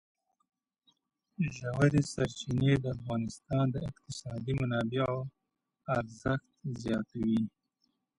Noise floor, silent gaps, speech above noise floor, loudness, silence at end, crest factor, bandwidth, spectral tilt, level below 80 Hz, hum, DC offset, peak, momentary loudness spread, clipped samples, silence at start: -79 dBFS; none; 47 dB; -33 LUFS; 0.7 s; 22 dB; 11.5 kHz; -7 dB/octave; -56 dBFS; none; under 0.1%; -12 dBFS; 11 LU; under 0.1%; 1.4 s